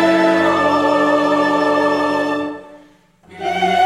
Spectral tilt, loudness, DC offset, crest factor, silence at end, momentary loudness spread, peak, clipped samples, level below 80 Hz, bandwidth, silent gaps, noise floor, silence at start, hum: -5 dB/octave; -16 LUFS; under 0.1%; 14 dB; 0 s; 10 LU; -2 dBFS; under 0.1%; -60 dBFS; 13 kHz; none; -49 dBFS; 0 s; none